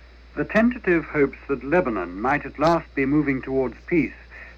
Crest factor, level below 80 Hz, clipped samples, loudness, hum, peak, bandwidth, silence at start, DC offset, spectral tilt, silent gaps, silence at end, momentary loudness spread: 16 dB; -44 dBFS; under 0.1%; -23 LUFS; none; -8 dBFS; 8 kHz; 0 s; under 0.1%; -8 dB/octave; none; 0 s; 9 LU